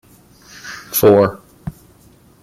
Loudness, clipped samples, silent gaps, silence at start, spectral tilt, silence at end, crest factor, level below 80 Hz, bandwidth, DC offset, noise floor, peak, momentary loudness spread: -14 LUFS; under 0.1%; none; 0.65 s; -5.5 dB/octave; 0.7 s; 16 dB; -50 dBFS; 16 kHz; under 0.1%; -48 dBFS; -2 dBFS; 22 LU